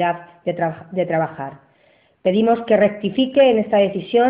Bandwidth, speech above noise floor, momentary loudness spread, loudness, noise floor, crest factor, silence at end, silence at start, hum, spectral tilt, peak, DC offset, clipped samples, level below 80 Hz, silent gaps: 5 kHz; 39 dB; 12 LU; -18 LUFS; -57 dBFS; 14 dB; 0 s; 0 s; none; -11 dB/octave; -4 dBFS; under 0.1%; under 0.1%; -60 dBFS; none